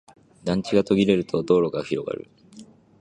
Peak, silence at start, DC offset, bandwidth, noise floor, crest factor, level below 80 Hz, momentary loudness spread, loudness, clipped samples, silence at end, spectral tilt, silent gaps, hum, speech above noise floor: -4 dBFS; 0.45 s; under 0.1%; 10 kHz; -48 dBFS; 18 dB; -54 dBFS; 13 LU; -23 LUFS; under 0.1%; 0.35 s; -7 dB/octave; none; none; 26 dB